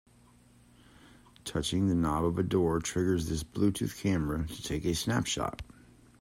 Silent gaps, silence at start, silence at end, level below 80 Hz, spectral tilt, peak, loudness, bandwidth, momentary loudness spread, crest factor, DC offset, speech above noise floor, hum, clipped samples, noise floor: none; 1.45 s; 0.55 s; -50 dBFS; -5.5 dB/octave; -14 dBFS; -31 LUFS; 16 kHz; 8 LU; 18 dB; under 0.1%; 30 dB; none; under 0.1%; -60 dBFS